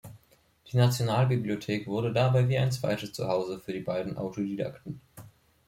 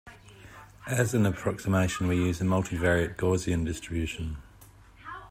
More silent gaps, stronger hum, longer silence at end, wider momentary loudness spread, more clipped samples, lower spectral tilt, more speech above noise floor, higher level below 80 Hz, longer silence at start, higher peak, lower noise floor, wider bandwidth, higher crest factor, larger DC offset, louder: neither; neither; first, 0.4 s vs 0 s; second, 10 LU vs 18 LU; neither; about the same, -6.5 dB/octave vs -6 dB/octave; first, 35 dB vs 26 dB; second, -62 dBFS vs -48 dBFS; about the same, 0.05 s vs 0.05 s; about the same, -10 dBFS vs -10 dBFS; first, -63 dBFS vs -53 dBFS; about the same, 15.5 kHz vs 16 kHz; about the same, 18 dB vs 18 dB; neither; about the same, -29 LUFS vs -28 LUFS